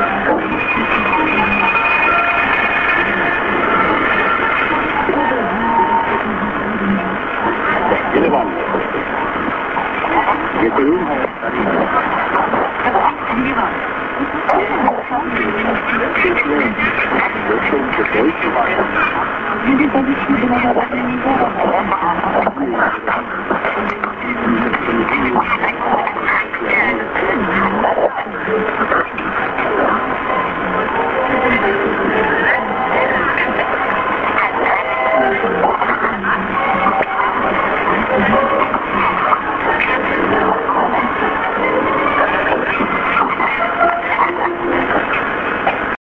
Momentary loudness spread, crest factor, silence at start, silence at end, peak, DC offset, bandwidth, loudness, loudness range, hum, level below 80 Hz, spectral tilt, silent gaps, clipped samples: 5 LU; 16 dB; 0 s; 0.1 s; 0 dBFS; under 0.1%; 7.2 kHz; -15 LUFS; 3 LU; none; -40 dBFS; -7.5 dB/octave; none; under 0.1%